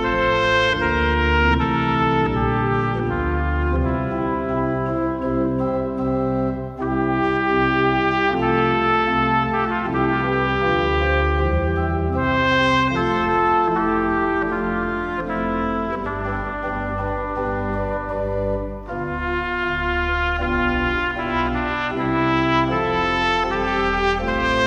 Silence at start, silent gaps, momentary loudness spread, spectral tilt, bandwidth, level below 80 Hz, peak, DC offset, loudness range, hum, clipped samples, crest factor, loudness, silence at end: 0 s; none; 7 LU; -7 dB/octave; 8.4 kHz; -32 dBFS; -4 dBFS; under 0.1%; 5 LU; none; under 0.1%; 16 dB; -20 LUFS; 0 s